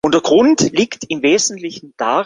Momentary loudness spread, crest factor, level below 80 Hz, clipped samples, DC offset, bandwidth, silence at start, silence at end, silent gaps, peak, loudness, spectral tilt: 12 LU; 14 dB; -54 dBFS; under 0.1%; under 0.1%; 10 kHz; 0.05 s; 0 s; none; 0 dBFS; -14 LUFS; -3.5 dB/octave